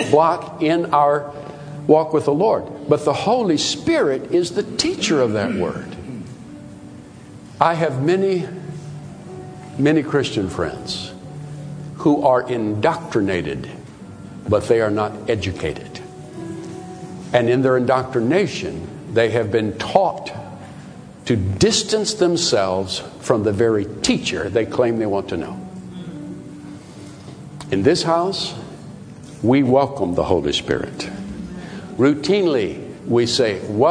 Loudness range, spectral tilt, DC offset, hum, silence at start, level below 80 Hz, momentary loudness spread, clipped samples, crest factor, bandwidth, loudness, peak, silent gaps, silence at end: 5 LU; -5 dB/octave; under 0.1%; none; 0 s; -50 dBFS; 19 LU; under 0.1%; 20 dB; 10.5 kHz; -19 LUFS; 0 dBFS; none; 0 s